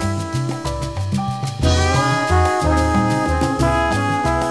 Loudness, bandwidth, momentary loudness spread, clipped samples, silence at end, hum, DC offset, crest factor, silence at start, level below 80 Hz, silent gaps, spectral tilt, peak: -18 LUFS; 11 kHz; 7 LU; under 0.1%; 0 s; none; 0.4%; 14 dB; 0 s; -28 dBFS; none; -5.5 dB/octave; -4 dBFS